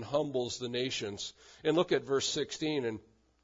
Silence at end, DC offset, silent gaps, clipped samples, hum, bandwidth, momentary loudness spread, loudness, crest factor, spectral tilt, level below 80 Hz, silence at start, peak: 0.45 s; under 0.1%; none; under 0.1%; none; 7.8 kHz; 9 LU; -33 LUFS; 20 dB; -4 dB/octave; -68 dBFS; 0 s; -14 dBFS